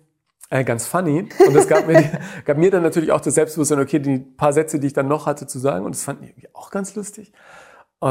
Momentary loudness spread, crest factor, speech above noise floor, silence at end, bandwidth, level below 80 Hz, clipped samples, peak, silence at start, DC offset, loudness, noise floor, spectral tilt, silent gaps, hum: 14 LU; 18 dB; 32 dB; 0 s; 16 kHz; -58 dBFS; under 0.1%; 0 dBFS; 0.5 s; under 0.1%; -18 LUFS; -51 dBFS; -6 dB/octave; none; none